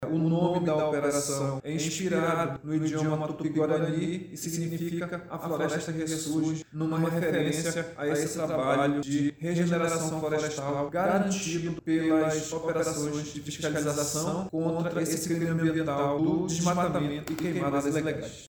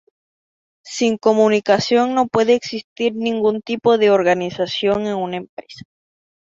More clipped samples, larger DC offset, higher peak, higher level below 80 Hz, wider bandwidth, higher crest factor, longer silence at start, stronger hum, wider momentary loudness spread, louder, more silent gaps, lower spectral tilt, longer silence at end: neither; neither; second, -14 dBFS vs -2 dBFS; about the same, -60 dBFS vs -60 dBFS; first, over 20 kHz vs 7.8 kHz; about the same, 14 dB vs 16 dB; second, 0 s vs 0.85 s; neither; second, 6 LU vs 12 LU; second, -29 LUFS vs -17 LUFS; second, none vs 2.84-2.96 s, 5.49-5.57 s; about the same, -5.5 dB/octave vs -5 dB/octave; second, 0 s vs 0.75 s